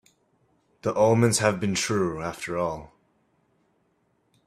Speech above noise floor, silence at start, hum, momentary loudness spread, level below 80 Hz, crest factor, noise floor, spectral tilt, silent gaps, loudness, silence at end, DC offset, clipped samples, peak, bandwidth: 45 dB; 0.85 s; none; 12 LU; -58 dBFS; 22 dB; -69 dBFS; -4.5 dB/octave; none; -24 LUFS; 1.6 s; under 0.1%; under 0.1%; -6 dBFS; 14.5 kHz